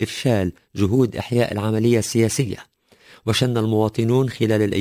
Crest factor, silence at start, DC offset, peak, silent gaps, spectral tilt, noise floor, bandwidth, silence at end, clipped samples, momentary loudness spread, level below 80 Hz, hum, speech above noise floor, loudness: 14 dB; 0 s; under 0.1%; -6 dBFS; none; -6 dB/octave; -51 dBFS; 16 kHz; 0 s; under 0.1%; 6 LU; -44 dBFS; none; 31 dB; -20 LUFS